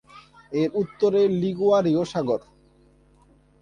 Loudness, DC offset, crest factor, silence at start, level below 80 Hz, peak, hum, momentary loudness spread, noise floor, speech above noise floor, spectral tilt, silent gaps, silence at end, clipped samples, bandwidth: -23 LUFS; under 0.1%; 14 dB; 0.15 s; -60 dBFS; -10 dBFS; none; 7 LU; -57 dBFS; 35 dB; -7.5 dB/octave; none; 1.25 s; under 0.1%; 9.6 kHz